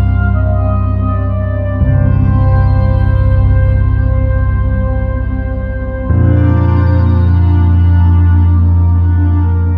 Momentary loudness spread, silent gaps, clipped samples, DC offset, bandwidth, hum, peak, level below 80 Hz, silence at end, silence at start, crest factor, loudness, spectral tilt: 6 LU; none; under 0.1%; under 0.1%; 3.3 kHz; none; 0 dBFS; -16 dBFS; 0 s; 0 s; 10 dB; -12 LUFS; -11.5 dB/octave